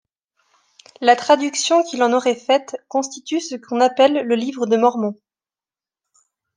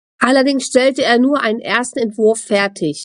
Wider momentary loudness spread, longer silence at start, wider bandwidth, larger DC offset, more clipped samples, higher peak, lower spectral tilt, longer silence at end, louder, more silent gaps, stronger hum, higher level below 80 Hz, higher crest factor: first, 10 LU vs 5 LU; first, 1 s vs 0.2 s; second, 10 kHz vs 11.5 kHz; neither; neither; about the same, -2 dBFS vs 0 dBFS; about the same, -3 dB/octave vs -3.5 dB/octave; first, 1.45 s vs 0 s; second, -18 LUFS vs -15 LUFS; neither; neither; second, -76 dBFS vs -60 dBFS; about the same, 18 dB vs 14 dB